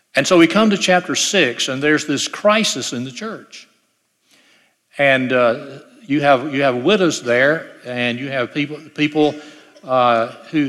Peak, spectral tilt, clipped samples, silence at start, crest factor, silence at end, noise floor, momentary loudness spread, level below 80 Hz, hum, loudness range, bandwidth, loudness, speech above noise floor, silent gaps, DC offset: 0 dBFS; -3.5 dB/octave; under 0.1%; 0.15 s; 16 dB; 0 s; -65 dBFS; 12 LU; -66 dBFS; none; 5 LU; 14 kHz; -16 LUFS; 48 dB; none; under 0.1%